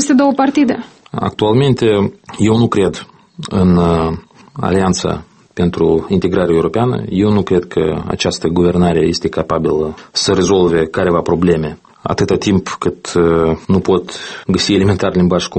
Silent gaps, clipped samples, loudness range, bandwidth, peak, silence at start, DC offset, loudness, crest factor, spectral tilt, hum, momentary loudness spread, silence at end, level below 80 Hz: none; under 0.1%; 2 LU; 8.8 kHz; 0 dBFS; 0 s; under 0.1%; -14 LUFS; 14 dB; -6 dB/octave; none; 9 LU; 0 s; -38 dBFS